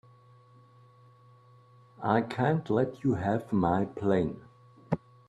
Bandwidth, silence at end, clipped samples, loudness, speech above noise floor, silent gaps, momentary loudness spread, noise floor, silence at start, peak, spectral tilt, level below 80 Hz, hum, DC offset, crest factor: 11.5 kHz; 0.3 s; under 0.1%; -29 LUFS; 30 dB; none; 9 LU; -58 dBFS; 2 s; -10 dBFS; -9 dB/octave; -62 dBFS; none; under 0.1%; 22 dB